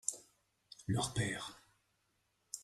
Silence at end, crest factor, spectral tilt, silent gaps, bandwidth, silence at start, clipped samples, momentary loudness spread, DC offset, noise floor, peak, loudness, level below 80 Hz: 0 s; 26 dB; -3.5 dB/octave; none; 13 kHz; 0.05 s; under 0.1%; 16 LU; under 0.1%; -80 dBFS; -18 dBFS; -40 LUFS; -64 dBFS